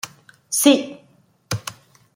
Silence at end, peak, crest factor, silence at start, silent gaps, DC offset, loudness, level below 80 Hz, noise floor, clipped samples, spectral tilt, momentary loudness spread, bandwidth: 0.45 s; -2 dBFS; 22 dB; 0.05 s; none; under 0.1%; -19 LUFS; -60 dBFS; -57 dBFS; under 0.1%; -3.5 dB/octave; 20 LU; 16.5 kHz